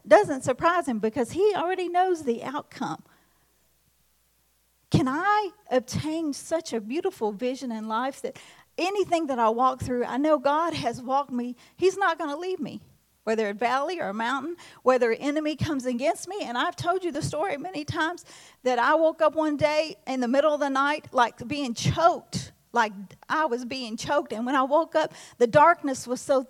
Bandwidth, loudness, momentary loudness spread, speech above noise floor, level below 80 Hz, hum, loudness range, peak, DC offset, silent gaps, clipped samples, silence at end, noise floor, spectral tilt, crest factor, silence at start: 16 kHz; -26 LUFS; 10 LU; 42 dB; -60 dBFS; none; 5 LU; -4 dBFS; under 0.1%; none; under 0.1%; 0.05 s; -67 dBFS; -5 dB/octave; 22 dB; 0.05 s